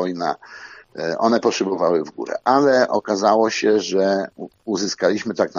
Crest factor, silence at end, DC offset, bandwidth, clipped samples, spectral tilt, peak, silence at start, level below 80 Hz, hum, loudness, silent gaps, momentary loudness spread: 18 dB; 0 s; under 0.1%; 7.4 kHz; under 0.1%; -4.5 dB/octave; -2 dBFS; 0 s; -66 dBFS; none; -19 LUFS; none; 15 LU